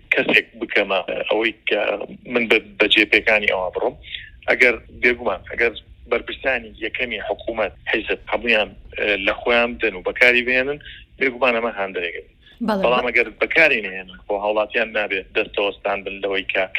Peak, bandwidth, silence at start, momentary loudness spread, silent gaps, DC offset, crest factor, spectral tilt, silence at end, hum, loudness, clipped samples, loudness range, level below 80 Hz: 0 dBFS; 14 kHz; 0.1 s; 12 LU; none; under 0.1%; 20 dB; -4.5 dB/octave; 0 s; none; -19 LUFS; under 0.1%; 4 LU; -48 dBFS